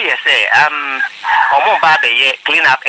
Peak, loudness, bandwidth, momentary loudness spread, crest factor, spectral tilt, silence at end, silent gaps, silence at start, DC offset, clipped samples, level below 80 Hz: 0 dBFS; -11 LUFS; 9.4 kHz; 6 LU; 12 dB; -1 dB/octave; 0 s; none; 0 s; under 0.1%; under 0.1%; -62 dBFS